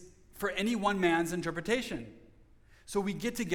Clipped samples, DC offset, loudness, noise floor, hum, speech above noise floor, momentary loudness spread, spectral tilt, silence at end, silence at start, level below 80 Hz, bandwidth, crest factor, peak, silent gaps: under 0.1%; under 0.1%; -32 LUFS; -59 dBFS; none; 28 dB; 10 LU; -4.5 dB/octave; 0 s; 0 s; -56 dBFS; 19 kHz; 18 dB; -16 dBFS; none